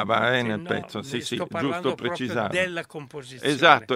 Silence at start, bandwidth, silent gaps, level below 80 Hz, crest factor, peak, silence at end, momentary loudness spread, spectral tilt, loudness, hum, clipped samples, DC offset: 0 s; 16 kHz; none; -64 dBFS; 24 dB; 0 dBFS; 0 s; 13 LU; -4.5 dB/octave; -25 LUFS; none; under 0.1%; under 0.1%